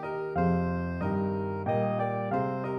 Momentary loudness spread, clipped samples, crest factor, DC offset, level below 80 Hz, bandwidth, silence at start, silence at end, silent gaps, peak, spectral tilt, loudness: 4 LU; under 0.1%; 14 dB; under 0.1%; -52 dBFS; 5.6 kHz; 0 s; 0 s; none; -16 dBFS; -10 dB/octave; -30 LUFS